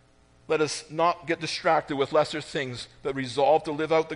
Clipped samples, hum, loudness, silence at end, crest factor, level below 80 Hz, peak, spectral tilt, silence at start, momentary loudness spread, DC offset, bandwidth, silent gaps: under 0.1%; none; -26 LUFS; 0 s; 18 dB; -62 dBFS; -10 dBFS; -4.5 dB/octave; 0.5 s; 9 LU; under 0.1%; 10.5 kHz; none